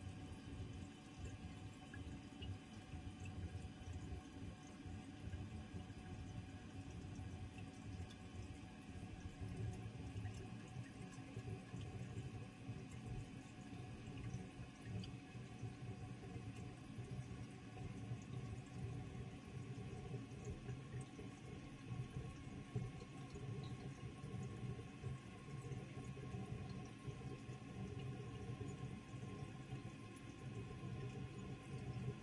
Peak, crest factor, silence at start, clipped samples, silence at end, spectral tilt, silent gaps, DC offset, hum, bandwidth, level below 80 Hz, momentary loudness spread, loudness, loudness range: -34 dBFS; 18 dB; 0 s; under 0.1%; 0 s; -6.5 dB/octave; none; under 0.1%; none; 11.5 kHz; -64 dBFS; 5 LU; -52 LUFS; 2 LU